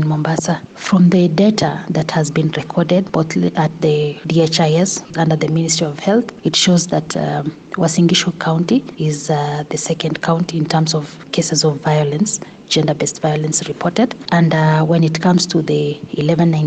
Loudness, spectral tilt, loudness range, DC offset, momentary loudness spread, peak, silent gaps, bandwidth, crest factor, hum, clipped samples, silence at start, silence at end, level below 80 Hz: -15 LUFS; -5 dB/octave; 2 LU; under 0.1%; 7 LU; -2 dBFS; none; 9.2 kHz; 12 dB; none; under 0.1%; 0 s; 0 s; -52 dBFS